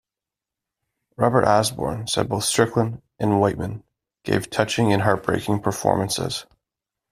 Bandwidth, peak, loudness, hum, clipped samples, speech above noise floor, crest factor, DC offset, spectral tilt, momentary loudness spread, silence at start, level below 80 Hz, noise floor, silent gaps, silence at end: 15 kHz; -2 dBFS; -22 LUFS; none; under 0.1%; 67 dB; 20 dB; under 0.1%; -5 dB/octave; 9 LU; 1.2 s; -52 dBFS; -88 dBFS; none; 0.7 s